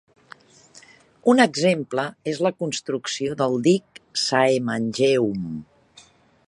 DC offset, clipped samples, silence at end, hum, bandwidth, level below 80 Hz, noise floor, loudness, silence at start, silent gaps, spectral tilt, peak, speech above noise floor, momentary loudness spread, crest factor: under 0.1%; under 0.1%; 0.85 s; none; 11.5 kHz; -64 dBFS; -53 dBFS; -22 LUFS; 0.75 s; none; -4.5 dB/octave; -2 dBFS; 32 dB; 10 LU; 20 dB